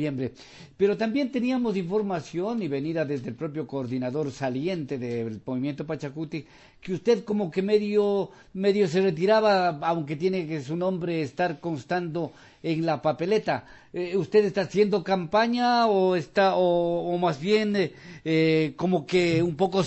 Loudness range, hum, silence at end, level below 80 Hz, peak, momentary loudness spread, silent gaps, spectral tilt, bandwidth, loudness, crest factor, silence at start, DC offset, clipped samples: 7 LU; none; 0 s; -62 dBFS; -8 dBFS; 11 LU; none; -6.5 dB/octave; 8.4 kHz; -26 LUFS; 16 dB; 0 s; under 0.1%; under 0.1%